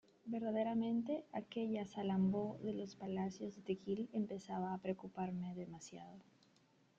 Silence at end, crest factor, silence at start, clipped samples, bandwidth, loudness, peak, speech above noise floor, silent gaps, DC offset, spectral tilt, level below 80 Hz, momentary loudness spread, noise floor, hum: 0.75 s; 16 dB; 0.25 s; under 0.1%; 7.6 kHz; -42 LUFS; -26 dBFS; 31 dB; none; under 0.1%; -7.5 dB/octave; -80 dBFS; 12 LU; -73 dBFS; none